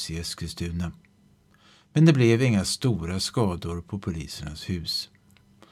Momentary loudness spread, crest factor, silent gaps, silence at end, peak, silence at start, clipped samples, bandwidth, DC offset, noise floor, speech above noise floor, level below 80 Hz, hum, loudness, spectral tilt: 14 LU; 20 dB; none; 0.65 s; -6 dBFS; 0 s; under 0.1%; 14.5 kHz; under 0.1%; -60 dBFS; 35 dB; -46 dBFS; none; -25 LUFS; -5.5 dB/octave